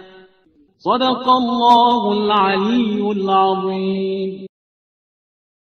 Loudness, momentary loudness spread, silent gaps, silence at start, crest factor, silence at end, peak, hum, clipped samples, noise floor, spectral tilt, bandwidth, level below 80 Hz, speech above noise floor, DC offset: -16 LUFS; 10 LU; none; 0.85 s; 18 dB; 1.2 s; 0 dBFS; none; under 0.1%; -55 dBFS; -6.5 dB/octave; 7.8 kHz; -60 dBFS; 39 dB; under 0.1%